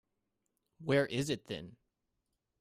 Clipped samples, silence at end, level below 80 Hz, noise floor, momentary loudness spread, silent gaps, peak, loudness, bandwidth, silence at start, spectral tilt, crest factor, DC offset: under 0.1%; 0.85 s; -70 dBFS; -85 dBFS; 13 LU; none; -16 dBFS; -35 LUFS; 15.5 kHz; 0.8 s; -5.5 dB/octave; 22 dB; under 0.1%